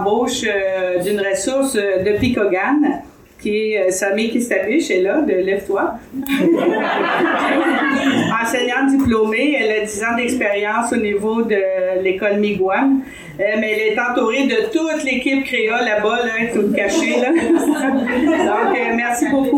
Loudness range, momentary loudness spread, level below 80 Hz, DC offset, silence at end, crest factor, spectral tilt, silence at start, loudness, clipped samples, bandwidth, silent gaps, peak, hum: 2 LU; 3 LU; -48 dBFS; under 0.1%; 0 s; 14 dB; -4 dB/octave; 0 s; -17 LUFS; under 0.1%; 19 kHz; none; -2 dBFS; none